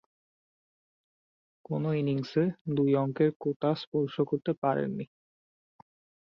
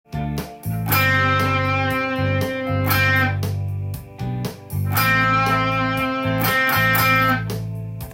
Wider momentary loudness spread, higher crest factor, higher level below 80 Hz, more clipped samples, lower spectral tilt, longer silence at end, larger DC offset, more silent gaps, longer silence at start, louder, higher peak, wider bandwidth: second, 7 LU vs 12 LU; about the same, 18 dB vs 16 dB; second, -72 dBFS vs -42 dBFS; neither; first, -9.5 dB/octave vs -5 dB/octave; first, 1.25 s vs 0 s; neither; first, 2.61-2.65 s, 3.36-3.40 s, 3.56-3.60 s, 3.87-3.92 s, 4.58-4.62 s vs none; first, 1.7 s vs 0.1 s; second, -30 LUFS vs -19 LUFS; second, -14 dBFS vs -6 dBFS; second, 6.6 kHz vs 17 kHz